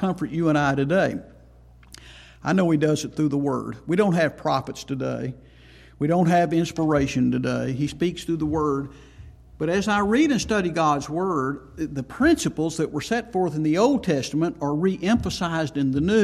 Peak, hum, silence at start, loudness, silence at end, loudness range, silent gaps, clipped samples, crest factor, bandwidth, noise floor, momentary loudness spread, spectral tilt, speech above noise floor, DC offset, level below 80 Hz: -6 dBFS; none; 0 s; -23 LUFS; 0 s; 2 LU; none; under 0.1%; 16 dB; 13.5 kHz; -50 dBFS; 9 LU; -6 dB/octave; 27 dB; under 0.1%; -48 dBFS